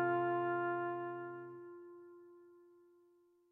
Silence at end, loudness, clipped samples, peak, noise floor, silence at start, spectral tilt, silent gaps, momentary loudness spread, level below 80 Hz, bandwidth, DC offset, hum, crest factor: 0.9 s; -39 LUFS; under 0.1%; -26 dBFS; -71 dBFS; 0 s; -9.5 dB/octave; none; 23 LU; under -90 dBFS; 3.7 kHz; under 0.1%; none; 16 dB